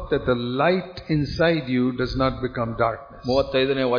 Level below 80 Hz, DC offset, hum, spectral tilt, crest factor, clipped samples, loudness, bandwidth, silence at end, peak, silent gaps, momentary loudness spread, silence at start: -42 dBFS; under 0.1%; none; -7.5 dB/octave; 16 dB; under 0.1%; -23 LUFS; 5.2 kHz; 0 s; -6 dBFS; none; 5 LU; 0 s